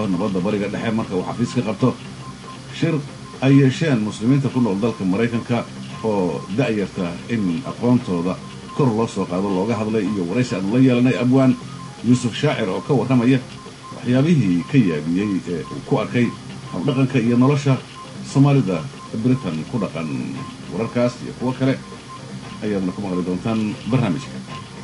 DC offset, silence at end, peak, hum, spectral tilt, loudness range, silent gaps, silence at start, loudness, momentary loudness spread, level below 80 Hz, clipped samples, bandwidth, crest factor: under 0.1%; 0 s; -4 dBFS; none; -7 dB/octave; 5 LU; none; 0 s; -20 LUFS; 14 LU; -50 dBFS; under 0.1%; 11.5 kHz; 16 dB